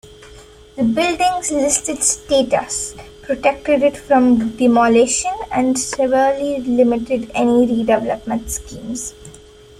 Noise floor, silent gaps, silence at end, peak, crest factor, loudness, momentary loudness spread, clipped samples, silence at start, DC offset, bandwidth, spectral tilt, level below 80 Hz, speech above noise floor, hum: -41 dBFS; none; 0.4 s; -2 dBFS; 16 dB; -17 LUFS; 12 LU; under 0.1%; 0.05 s; under 0.1%; 14.5 kHz; -3.5 dB/octave; -44 dBFS; 25 dB; none